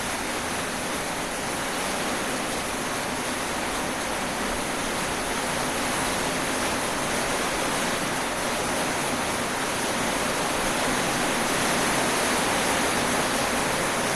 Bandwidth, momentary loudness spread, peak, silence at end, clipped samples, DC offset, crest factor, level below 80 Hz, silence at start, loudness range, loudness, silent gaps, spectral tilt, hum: 14.5 kHz; 5 LU; -10 dBFS; 0 s; under 0.1%; 0.2%; 16 dB; -46 dBFS; 0 s; 4 LU; -25 LUFS; none; -2.5 dB/octave; none